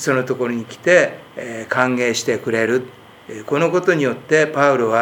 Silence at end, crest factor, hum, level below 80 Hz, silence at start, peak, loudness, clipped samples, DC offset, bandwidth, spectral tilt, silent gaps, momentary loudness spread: 0 s; 18 dB; none; -66 dBFS; 0 s; 0 dBFS; -17 LUFS; under 0.1%; under 0.1%; 18.5 kHz; -4.5 dB/octave; none; 15 LU